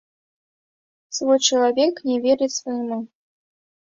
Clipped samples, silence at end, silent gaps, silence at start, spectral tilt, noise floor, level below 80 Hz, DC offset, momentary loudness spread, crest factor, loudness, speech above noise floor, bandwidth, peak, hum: under 0.1%; 0.9 s; none; 1.1 s; -2 dB/octave; under -90 dBFS; -70 dBFS; under 0.1%; 13 LU; 20 dB; -20 LUFS; over 70 dB; 7.8 kHz; -4 dBFS; none